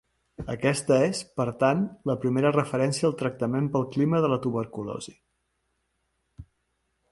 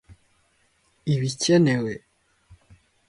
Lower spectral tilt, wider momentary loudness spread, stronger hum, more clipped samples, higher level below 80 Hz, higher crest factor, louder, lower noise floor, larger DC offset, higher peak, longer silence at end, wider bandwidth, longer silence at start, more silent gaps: about the same, -6 dB/octave vs -5.5 dB/octave; second, 12 LU vs 15 LU; neither; neither; about the same, -58 dBFS vs -60 dBFS; about the same, 20 dB vs 18 dB; second, -26 LUFS vs -23 LUFS; first, -76 dBFS vs -65 dBFS; neither; about the same, -8 dBFS vs -8 dBFS; first, 0.7 s vs 0.55 s; about the same, 11.5 kHz vs 11.5 kHz; first, 0.4 s vs 0.1 s; neither